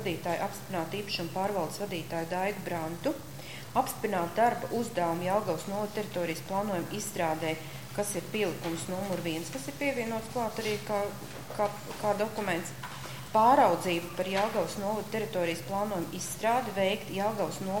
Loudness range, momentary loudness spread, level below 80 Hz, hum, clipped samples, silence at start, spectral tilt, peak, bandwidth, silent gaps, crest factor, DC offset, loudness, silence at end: 5 LU; 7 LU; -60 dBFS; none; under 0.1%; 0 s; -4.5 dB/octave; -10 dBFS; 17 kHz; none; 20 dB; 0.3%; -31 LUFS; 0 s